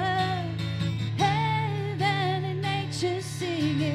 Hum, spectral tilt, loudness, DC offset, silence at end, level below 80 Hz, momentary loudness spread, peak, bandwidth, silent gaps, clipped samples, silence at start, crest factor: none; -5.5 dB/octave; -28 LUFS; under 0.1%; 0 s; -58 dBFS; 5 LU; -12 dBFS; 13.5 kHz; none; under 0.1%; 0 s; 16 dB